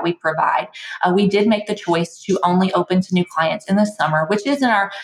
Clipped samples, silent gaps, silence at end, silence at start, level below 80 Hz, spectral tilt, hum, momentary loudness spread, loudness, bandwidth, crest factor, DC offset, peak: under 0.1%; none; 0 s; 0 s; -66 dBFS; -6 dB/octave; none; 5 LU; -18 LUFS; 11.5 kHz; 14 dB; under 0.1%; -4 dBFS